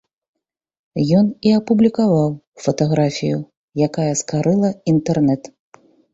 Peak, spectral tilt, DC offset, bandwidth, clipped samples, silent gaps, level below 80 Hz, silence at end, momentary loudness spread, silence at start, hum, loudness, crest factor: -2 dBFS; -6.5 dB/octave; under 0.1%; 8 kHz; under 0.1%; 2.47-2.52 s, 3.57-3.68 s; -54 dBFS; 0.65 s; 9 LU; 0.95 s; none; -18 LUFS; 16 dB